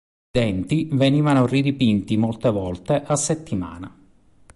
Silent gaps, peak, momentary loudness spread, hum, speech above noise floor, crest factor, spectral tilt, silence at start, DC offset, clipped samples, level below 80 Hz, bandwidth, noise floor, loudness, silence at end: none; -6 dBFS; 11 LU; none; 33 dB; 16 dB; -6 dB/octave; 0.35 s; under 0.1%; under 0.1%; -46 dBFS; 11.5 kHz; -53 dBFS; -21 LUFS; 0.7 s